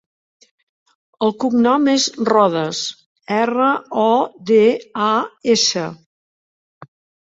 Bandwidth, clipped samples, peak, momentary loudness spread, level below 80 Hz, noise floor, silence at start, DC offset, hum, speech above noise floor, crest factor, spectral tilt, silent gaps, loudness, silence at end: 8 kHz; under 0.1%; -2 dBFS; 8 LU; -64 dBFS; under -90 dBFS; 1.2 s; under 0.1%; none; over 74 dB; 16 dB; -3.5 dB/octave; 3.06-3.16 s, 6.06-6.81 s; -17 LUFS; 0.45 s